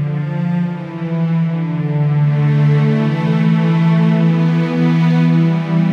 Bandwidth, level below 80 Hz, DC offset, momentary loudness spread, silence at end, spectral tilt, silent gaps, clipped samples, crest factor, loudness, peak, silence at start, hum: 5.6 kHz; -58 dBFS; under 0.1%; 6 LU; 0 s; -9.5 dB/octave; none; under 0.1%; 10 dB; -15 LUFS; -4 dBFS; 0 s; none